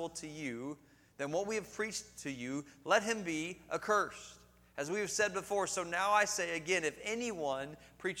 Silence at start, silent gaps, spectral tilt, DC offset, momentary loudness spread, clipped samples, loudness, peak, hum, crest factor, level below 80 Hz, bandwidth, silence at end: 0 s; none; -3 dB/octave; under 0.1%; 12 LU; under 0.1%; -36 LUFS; -16 dBFS; none; 22 dB; -70 dBFS; 18 kHz; 0 s